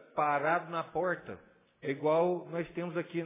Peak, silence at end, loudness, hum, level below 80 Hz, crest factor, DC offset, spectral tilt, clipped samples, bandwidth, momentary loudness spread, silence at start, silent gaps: -16 dBFS; 0 s; -33 LUFS; none; -72 dBFS; 16 dB; under 0.1%; -5 dB/octave; under 0.1%; 3.9 kHz; 11 LU; 0.15 s; none